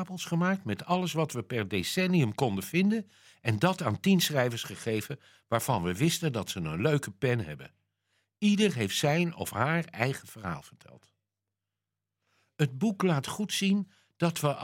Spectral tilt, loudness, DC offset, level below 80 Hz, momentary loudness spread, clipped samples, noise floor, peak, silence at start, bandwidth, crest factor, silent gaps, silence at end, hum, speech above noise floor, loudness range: -5 dB/octave; -29 LUFS; under 0.1%; -68 dBFS; 9 LU; under 0.1%; -88 dBFS; -8 dBFS; 0 s; 16.5 kHz; 22 dB; none; 0 s; none; 59 dB; 6 LU